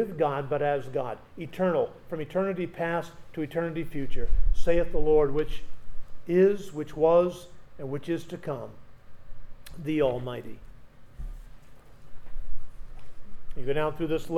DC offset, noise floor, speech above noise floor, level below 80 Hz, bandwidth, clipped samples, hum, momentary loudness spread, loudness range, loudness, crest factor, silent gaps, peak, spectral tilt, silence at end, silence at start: under 0.1%; -47 dBFS; 23 dB; -36 dBFS; 7.4 kHz; under 0.1%; none; 22 LU; 10 LU; -29 LUFS; 16 dB; none; -8 dBFS; -7.5 dB/octave; 0 s; 0 s